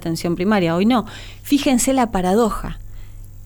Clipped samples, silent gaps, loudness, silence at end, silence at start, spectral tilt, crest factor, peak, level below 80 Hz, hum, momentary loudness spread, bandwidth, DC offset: under 0.1%; none; -18 LUFS; 0 s; 0 s; -5 dB/octave; 14 dB; -6 dBFS; -36 dBFS; none; 17 LU; 19.5 kHz; under 0.1%